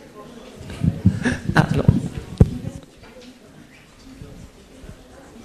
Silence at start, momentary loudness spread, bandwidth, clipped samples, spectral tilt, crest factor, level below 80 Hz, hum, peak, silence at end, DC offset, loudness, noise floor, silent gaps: 0.05 s; 25 LU; 13.5 kHz; under 0.1%; -7.5 dB/octave; 22 dB; -34 dBFS; none; -2 dBFS; 0 s; under 0.1%; -20 LUFS; -46 dBFS; none